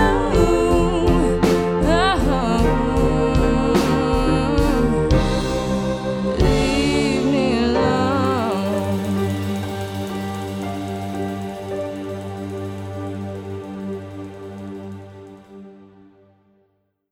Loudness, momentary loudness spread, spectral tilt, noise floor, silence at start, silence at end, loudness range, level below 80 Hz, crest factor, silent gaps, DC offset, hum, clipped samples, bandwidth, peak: -20 LUFS; 13 LU; -6.5 dB/octave; -66 dBFS; 0 s; 1.25 s; 14 LU; -28 dBFS; 18 dB; none; under 0.1%; none; under 0.1%; 17 kHz; -2 dBFS